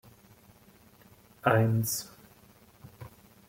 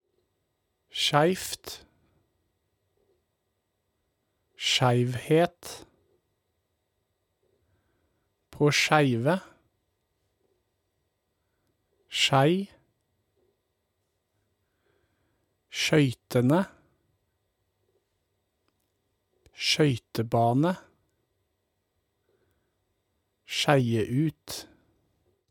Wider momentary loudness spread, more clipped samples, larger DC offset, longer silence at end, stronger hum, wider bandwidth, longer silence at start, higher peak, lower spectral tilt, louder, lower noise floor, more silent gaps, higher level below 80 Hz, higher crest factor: first, 25 LU vs 16 LU; neither; neither; second, 0.4 s vs 0.9 s; neither; about the same, 17 kHz vs 18 kHz; first, 1.45 s vs 0.95 s; about the same, -8 dBFS vs -6 dBFS; about the same, -5.5 dB/octave vs -5 dB/octave; second, -28 LUFS vs -25 LUFS; second, -58 dBFS vs -78 dBFS; neither; about the same, -66 dBFS vs -66 dBFS; about the same, 24 dB vs 24 dB